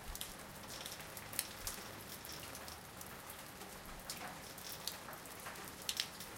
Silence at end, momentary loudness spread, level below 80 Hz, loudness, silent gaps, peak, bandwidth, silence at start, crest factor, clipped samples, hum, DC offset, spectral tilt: 0 s; 9 LU; -62 dBFS; -46 LUFS; none; -12 dBFS; 17 kHz; 0 s; 36 dB; under 0.1%; none; under 0.1%; -1.5 dB/octave